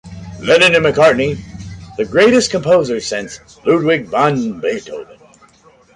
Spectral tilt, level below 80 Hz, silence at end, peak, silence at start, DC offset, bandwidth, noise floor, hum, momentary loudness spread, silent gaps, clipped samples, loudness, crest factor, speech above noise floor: -4.5 dB/octave; -44 dBFS; 0.85 s; 0 dBFS; 0.05 s; under 0.1%; 11.5 kHz; -48 dBFS; none; 20 LU; none; under 0.1%; -14 LUFS; 14 dB; 35 dB